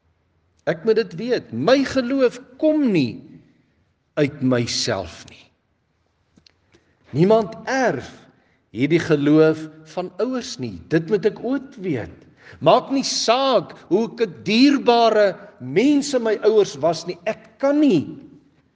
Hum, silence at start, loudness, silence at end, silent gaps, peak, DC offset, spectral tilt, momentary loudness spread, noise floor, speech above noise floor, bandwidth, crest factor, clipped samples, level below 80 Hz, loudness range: none; 0.65 s; -20 LUFS; 0.5 s; none; 0 dBFS; under 0.1%; -5 dB/octave; 13 LU; -67 dBFS; 48 dB; 9.6 kHz; 20 dB; under 0.1%; -62 dBFS; 7 LU